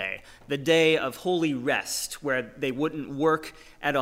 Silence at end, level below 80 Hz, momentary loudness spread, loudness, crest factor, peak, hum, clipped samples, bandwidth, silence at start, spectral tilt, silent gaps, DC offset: 0 s; -58 dBFS; 11 LU; -26 LUFS; 18 dB; -10 dBFS; none; under 0.1%; 16 kHz; 0 s; -4 dB/octave; none; under 0.1%